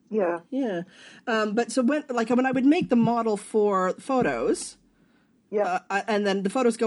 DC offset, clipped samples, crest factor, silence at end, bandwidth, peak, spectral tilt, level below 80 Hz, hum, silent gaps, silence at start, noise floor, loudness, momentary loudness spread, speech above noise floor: under 0.1%; under 0.1%; 14 dB; 0 s; 11.5 kHz; -10 dBFS; -5.5 dB/octave; -64 dBFS; none; none; 0.1 s; -62 dBFS; -25 LUFS; 9 LU; 38 dB